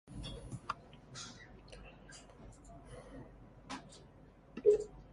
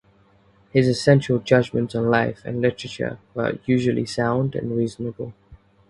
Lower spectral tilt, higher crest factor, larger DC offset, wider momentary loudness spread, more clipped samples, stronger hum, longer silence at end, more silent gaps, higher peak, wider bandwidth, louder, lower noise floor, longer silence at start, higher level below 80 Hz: second, -5 dB/octave vs -7 dB/octave; about the same, 26 dB vs 22 dB; neither; first, 25 LU vs 11 LU; neither; neither; second, 0 s vs 0.35 s; neither; second, -16 dBFS vs 0 dBFS; about the same, 11.5 kHz vs 11.5 kHz; second, -38 LUFS vs -22 LUFS; about the same, -60 dBFS vs -57 dBFS; second, 0.05 s vs 0.75 s; second, -58 dBFS vs -52 dBFS